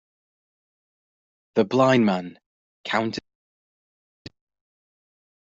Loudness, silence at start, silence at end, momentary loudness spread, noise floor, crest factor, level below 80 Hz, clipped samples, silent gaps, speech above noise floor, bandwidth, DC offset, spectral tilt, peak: -22 LUFS; 1.55 s; 2.2 s; 18 LU; under -90 dBFS; 22 dB; -68 dBFS; under 0.1%; 2.46-2.84 s; over 69 dB; 7.8 kHz; under 0.1%; -6.5 dB/octave; -6 dBFS